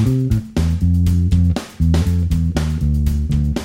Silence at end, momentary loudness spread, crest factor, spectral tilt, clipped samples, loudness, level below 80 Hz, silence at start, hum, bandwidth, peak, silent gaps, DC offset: 0 s; 4 LU; 12 dB; -7.5 dB/octave; under 0.1%; -18 LUFS; -22 dBFS; 0 s; none; 15 kHz; -4 dBFS; none; under 0.1%